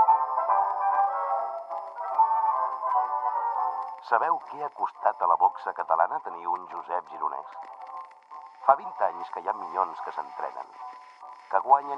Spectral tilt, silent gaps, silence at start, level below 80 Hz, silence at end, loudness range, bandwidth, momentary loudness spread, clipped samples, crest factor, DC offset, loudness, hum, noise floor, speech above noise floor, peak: -5 dB/octave; none; 0 s; -88 dBFS; 0 s; 4 LU; 6 kHz; 18 LU; under 0.1%; 24 dB; under 0.1%; -27 LUFS; none; -47 dBFS; 19 dB; -4 dBFS